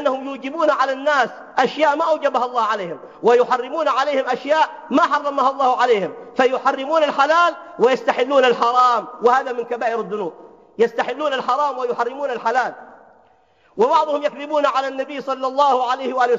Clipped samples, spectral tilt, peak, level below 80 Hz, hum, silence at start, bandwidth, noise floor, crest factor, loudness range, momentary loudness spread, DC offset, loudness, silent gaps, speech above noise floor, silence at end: under 0.1%; -4 dB/octave; -2 dBFS; -72 dBFS; none; 0 s; 7.6 kHz; -56 dBFS; 18 dB; 5 LU; 8 LU; under 0.1%; -19 LUFS; none; 38 dB; 0 s